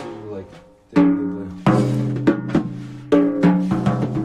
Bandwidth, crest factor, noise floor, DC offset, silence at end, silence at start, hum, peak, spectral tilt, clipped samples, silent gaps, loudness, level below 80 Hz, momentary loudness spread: 9.8 kHz; 14 dB; -44 dBFS; under 0.1%; 0 s; 0 s; none; -4 dBFS; -8.5 dB/octave; under 0.1%; none; -19 LUFS; -48 dBFS; 15 LU